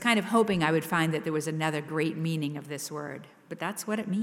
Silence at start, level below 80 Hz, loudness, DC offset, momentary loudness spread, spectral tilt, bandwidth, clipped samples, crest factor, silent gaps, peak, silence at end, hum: 0 s; -66 dBFS; -29 LUFS; under 0.1%; 12 LU; -5 dB/octave; 16.5 kHz; under 0.1%; 20 dB; none; -8 dBFS; 0 s; none